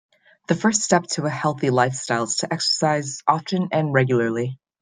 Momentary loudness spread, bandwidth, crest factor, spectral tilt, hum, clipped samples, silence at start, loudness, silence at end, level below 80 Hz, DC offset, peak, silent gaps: 5 LU; 10 kHz; 20 dB; -4 dB/octave; none; under 0.1%; 0.5 s; -21 LUFS; 0.25 s; -64 dBFS; under 0.1%; -2 dBFS; none